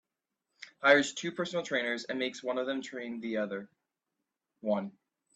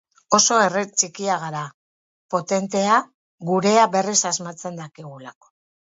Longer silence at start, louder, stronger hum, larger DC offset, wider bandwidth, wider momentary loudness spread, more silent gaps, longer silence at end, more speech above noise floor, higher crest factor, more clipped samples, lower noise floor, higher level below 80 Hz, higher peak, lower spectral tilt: first, 0.6 s vs 0.3 s; second, -32 LUFS vs -20 LUFS; neither; neither; first, 9.2 kHz vs 8.2 kHz; second, 16 LU vs 19 LU; second, none vs 1.74-2.29 s, 3.14-3.38 s; about the same, 0.45 s vs 0.55 s; second, 56 dB vs over 69 dB; about the same, 24 dB vs 22 dB; neither; about the same, -87 dBFS vs under -90 dBFS; second, -80 dBFS vs -72 dBFS; second, -10 dBFS vs 0 dBFS; about the same, -3.5 dB/octave vs -2.5 dB/octave